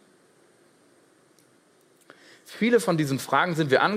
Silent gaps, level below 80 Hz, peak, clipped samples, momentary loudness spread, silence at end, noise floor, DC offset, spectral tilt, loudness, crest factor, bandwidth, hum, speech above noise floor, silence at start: none; -74 dBFS; -6 dBFS; under 0.1%; 5 LU; 0 s; -61 dBFS; under 0.1%; -5.5 dB/octave; -23 LUFS; 20 dB; 16 kHz; none; 38 dB; 2.5 s